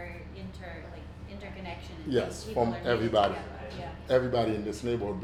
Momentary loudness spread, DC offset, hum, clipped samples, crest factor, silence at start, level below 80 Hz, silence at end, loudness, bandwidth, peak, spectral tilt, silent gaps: 17 LU; under 0.1%; none; under 0.1%; 20 dB; 0 s; -48 dBFS; 0 s; -30 LUFS; 14.5 kHz; -12 dBFS; -6 dB/octave; none